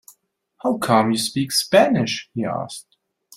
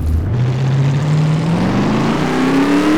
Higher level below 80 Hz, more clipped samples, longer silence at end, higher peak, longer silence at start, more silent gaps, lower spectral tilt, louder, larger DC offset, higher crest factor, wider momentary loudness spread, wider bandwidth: second, -62 dBFS vs -28 dBFS; neither; first, 0.55 s vs 0 s; first, -2 dBFS vs -6 dBFS; first, 0.65 s vs 0 s; neither; second, -4.5 dB/octave vs -7 dB/octave; second, -20 LUFS vs -15 LUFS; neither; first, 20 dB vs 8 dB; first, 12 LU vs 3 LU; first, 16 kHz vs 13 kHz